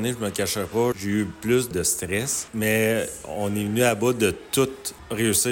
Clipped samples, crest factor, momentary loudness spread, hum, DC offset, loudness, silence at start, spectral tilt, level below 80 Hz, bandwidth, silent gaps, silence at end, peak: under 0.1%; 16 dB; 6 LU; none; under 0.1%; -24 LUFS; 0 s; -4 dB/octave; -52 dBFS; 17 kHz; none; 0 s; -8 dBFS